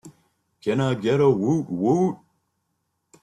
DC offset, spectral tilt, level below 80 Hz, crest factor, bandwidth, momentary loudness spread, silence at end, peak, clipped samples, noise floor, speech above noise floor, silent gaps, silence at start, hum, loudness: under 0.1%; -7.5 dB/octave; -62 dBFS; 16 dB; 11 kHz; 8 LU; 1.1 s; -8 dBFS; under 0.1%; -75 dBFS; 54 dB; none; 0.05 s; none; -22 LUFS